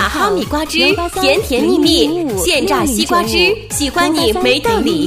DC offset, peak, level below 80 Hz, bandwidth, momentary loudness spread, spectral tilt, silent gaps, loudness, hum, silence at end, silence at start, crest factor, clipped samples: under 0.1%; 0 dBFS; -32 dBFS; 16 kHz; 4 LU; -3.5 dB/octave; none; -13 LUFS; none; 0 s; 0 s; 14 dB; under 0.1%